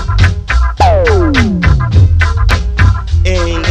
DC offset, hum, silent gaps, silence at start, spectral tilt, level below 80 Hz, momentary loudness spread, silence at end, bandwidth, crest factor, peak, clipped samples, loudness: under 0.1%; none; none; 0 s; -6.5 dB/octave; -14 dBFS; 4 LU; 0 s; 8.8 kHz; 8 dB; 0 dBFS; under 0.1%; -11 LUFS